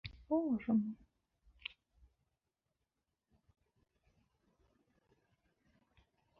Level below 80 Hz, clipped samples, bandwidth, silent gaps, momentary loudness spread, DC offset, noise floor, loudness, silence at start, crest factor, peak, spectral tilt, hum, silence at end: -70 dBFS; under 0.1%; 5.4 kHz; none; 16 LU; under 0.1%; -89 dBFS; -37 LUFS; 0.05 s; 20 dB; -24 dBFS; -6 dB/octave; none; 5.45 s